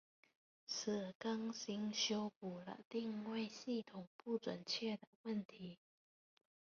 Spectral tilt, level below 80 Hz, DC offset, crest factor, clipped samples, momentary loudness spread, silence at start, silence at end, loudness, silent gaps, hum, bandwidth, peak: -3.5 dB/octave; -86 dBFS; under 0.1%; 20 dB; under 0.1%; 13 LU; 0.7 s; 0.9 s; -45 LUFS; 1.15-1.20 s, 2.36-2.41 s, 2.85-2.91 s, 4.07-4.19 s, 5.07-5.24 s, 5.45-5.49 s; none; 7.2 kHz; -26 dBFS